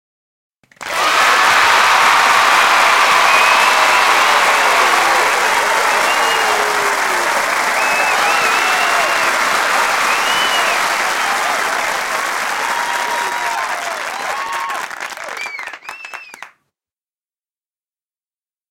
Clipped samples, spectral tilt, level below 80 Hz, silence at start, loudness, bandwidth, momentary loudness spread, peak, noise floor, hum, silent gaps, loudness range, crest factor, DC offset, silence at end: under 0.1%; 0.5 dB/octave; -58 dBFS; 0.8 s; -13 LUFS; 17 kHz; 13 LU; 0 dBFS; under -90 dBFS; none; none; 14 LU; 16 dB; 0.3%; 2.25 s